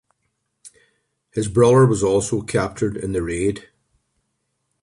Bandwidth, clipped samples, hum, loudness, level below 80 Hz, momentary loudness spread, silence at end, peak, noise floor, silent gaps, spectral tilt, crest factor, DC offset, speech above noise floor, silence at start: 11.5 kHz; under 0.1%; none; -19 LUFS; -44 dBFS; 12 LU; 1.2 s; -4 dBFS; -73 dBFS; none; -6.5 dB/octave; 18 dB; under 0.1%; 55 dB; 0.65 s